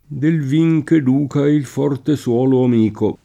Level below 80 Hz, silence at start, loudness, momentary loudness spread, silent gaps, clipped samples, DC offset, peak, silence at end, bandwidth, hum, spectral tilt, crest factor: -54 dBFS; 0.1 s; -16 LUFS; 4 LU; none; under 0.1%; under 0.1%; -4 dBFS; 0.1 s; 12.5 kHz; none; -8.5 dB/octave; 12 dB